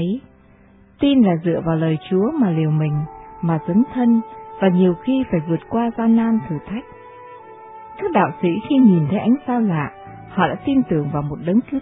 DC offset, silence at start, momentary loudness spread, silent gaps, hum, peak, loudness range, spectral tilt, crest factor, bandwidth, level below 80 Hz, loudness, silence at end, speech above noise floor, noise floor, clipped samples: under 0.1%; 0 s; 15 LU; none; none; -2 dBFS; 3 LU; -12 dB/octave; 16 dB; 3.9 kHz; -50 dBFS; -19 LUFS; 0 s; 32 dB; -49 dBFS; under 0.1%